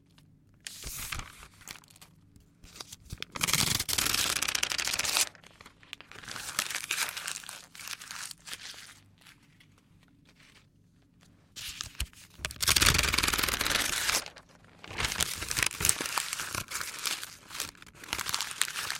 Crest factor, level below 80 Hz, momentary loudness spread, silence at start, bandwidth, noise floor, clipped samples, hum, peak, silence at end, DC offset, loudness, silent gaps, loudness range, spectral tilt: 34 dB; -50 dBFS; 20 LU; 0.65 s; 17 kHz; -63 dBFS; under 0.1%; none; 0 dBFS; 0 s; under 0.1%; -30 LUFS; none; 17 LU; -0.5 dB/octave